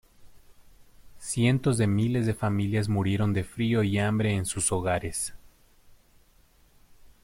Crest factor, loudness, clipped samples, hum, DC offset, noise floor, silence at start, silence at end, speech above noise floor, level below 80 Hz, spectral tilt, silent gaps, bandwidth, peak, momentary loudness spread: 18 dB; -27 LUFS; under 0.1%; none; under 0.1%; -60 dBFS; 0.2 s; 1.3 s; 34 dB; -52 dBFS; -5.5 dB/octave; none; 16 kHz; -10 dBFS; 6 LU